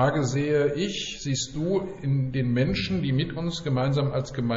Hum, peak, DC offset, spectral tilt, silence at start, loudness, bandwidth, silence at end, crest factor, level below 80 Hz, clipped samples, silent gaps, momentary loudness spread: none; -12 dBFS; under 0.1%; -6 dB/octave; 0 s; -26 LUFS; 8 kHz; 0 s; 14 dB; -46 dBFS; under 0.1%; none; 5 LU